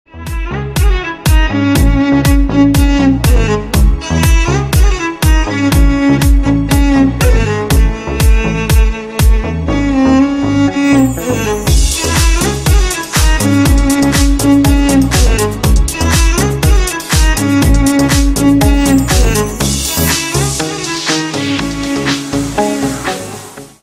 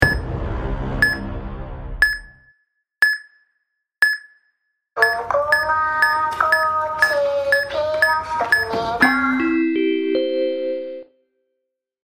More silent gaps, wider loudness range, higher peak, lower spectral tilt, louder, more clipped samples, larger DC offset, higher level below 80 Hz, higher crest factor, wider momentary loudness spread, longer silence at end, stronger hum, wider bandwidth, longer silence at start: neither; about the same, 2 LU vs 4 LU; about the same, 0 dBFS vs 0 dBFS; about the same, -5 dB/octave vs -5 dB/octave; first, -12 LUFS vs -19 LUFS; neither; neither; first, -14 dBFS vs -36 dBFS; second, 10 dB vs 20 dB; second, 6 LU vs 11 LU; second, 0.15 s vs 1 s; neither; second, 16 kHz vs over 20 kHz; first, 0.15 s vs 0 s